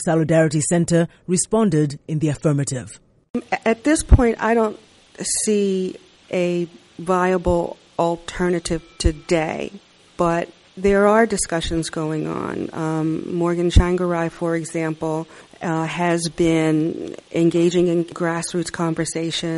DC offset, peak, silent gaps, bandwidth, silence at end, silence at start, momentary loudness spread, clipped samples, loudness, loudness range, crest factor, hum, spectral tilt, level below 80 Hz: under 0.1%; -2 dBFS; 3.30-3.34 s; 11.5 kHz; 0 s; 0 s; 10 LU; under 0.1%; -20 LUFS; 2 LU; 18 dB; none; -5.5 dB/octave; -30 dBFS